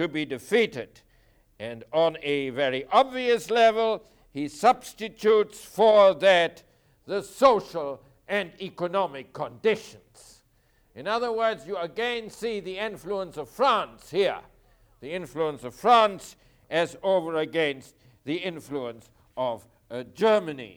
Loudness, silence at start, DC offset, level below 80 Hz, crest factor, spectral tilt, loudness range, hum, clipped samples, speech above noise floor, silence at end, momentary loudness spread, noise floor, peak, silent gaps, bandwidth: -25 LUFS; 0 s; under 0.1%; -64 dBFS; 20 dB; -4.5 dB/octave; 8 LU; none; under 0.1%; 39 dB; 0.05 s; 18 LU; -64 dBFS; -6 dBFS; none; 19 kHz